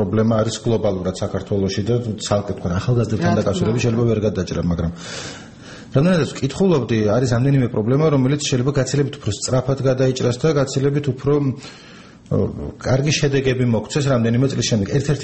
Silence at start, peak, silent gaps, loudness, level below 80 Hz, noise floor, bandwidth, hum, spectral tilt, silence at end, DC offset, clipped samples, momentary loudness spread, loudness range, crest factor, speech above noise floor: 0 s; -2 dBFS; none; -19 LUFS; -42 dBFS; -38 dBFS; 8.8 kHz; none; -6 dB/octave; 0 s; 0.2%; under 0.1%; 7 LU; 3 LU; 18 dB; 20 dB